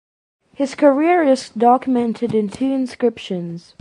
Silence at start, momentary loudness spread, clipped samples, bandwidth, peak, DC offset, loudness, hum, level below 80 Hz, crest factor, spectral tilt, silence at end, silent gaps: 0.6 s; 12 LU; under 0.1%; 11 kHz; -2 dBFS; under 0.1%; -18 LUFS; none; -60 dBFS; 16 dB; -6 dB/octave; 0.2 s; none